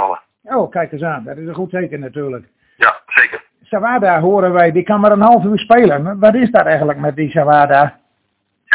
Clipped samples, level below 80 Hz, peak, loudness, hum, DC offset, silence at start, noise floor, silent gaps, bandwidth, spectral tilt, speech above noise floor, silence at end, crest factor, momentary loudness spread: 0.4%; -52 dBFS; 0 dBFS; -13 LUFS; none; under 0.1%; 0 s; -67 dBFS; none; 4 kHz; -10 dB/octave; 54 dB; 0 s; 14 dB; 14 LU